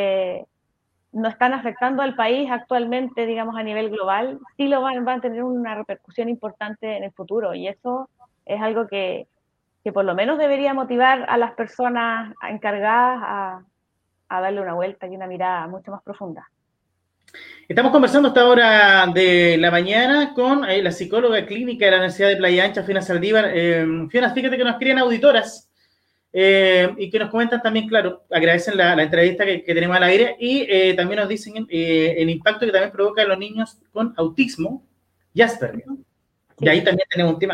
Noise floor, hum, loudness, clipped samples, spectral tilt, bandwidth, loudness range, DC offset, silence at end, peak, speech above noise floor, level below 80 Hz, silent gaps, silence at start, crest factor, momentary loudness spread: -73 dBFS; none; -18 LUFS; under 0.1%; -5.5 dB/octave; 10.5 kHz; 12 LU; under 0.1%; 0 s; -2 dBFS; 54 dB; -64 dBFS; none; 0 s; 18 dB; 14 LU